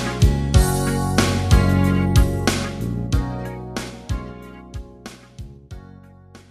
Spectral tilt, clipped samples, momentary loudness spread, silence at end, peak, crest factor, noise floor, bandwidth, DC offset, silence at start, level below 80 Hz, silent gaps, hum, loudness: -5.5 dB/octave; under 0.1%; 22 LU; 0.15 s; 0 dBFS; 20 dB; -45 dBFS; 15.5 kHz; under 0.1%; 0 s; -26 dBFS; none; none; -20 LUFS